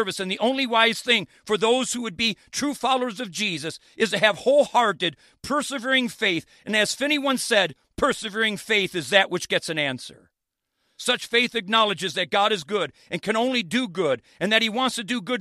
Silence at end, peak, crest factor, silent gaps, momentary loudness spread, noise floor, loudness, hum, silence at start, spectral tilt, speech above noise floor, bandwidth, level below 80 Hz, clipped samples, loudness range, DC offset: 0 s; -2 dBFS; 22 dB; none; 8 LU; -80 dBFS; -23 LUFS; none; 0 s; -3 dB/octave; 57 dB; 15 kHz; -60 dBFS; under 0.1%; 2 LU; under 0.1%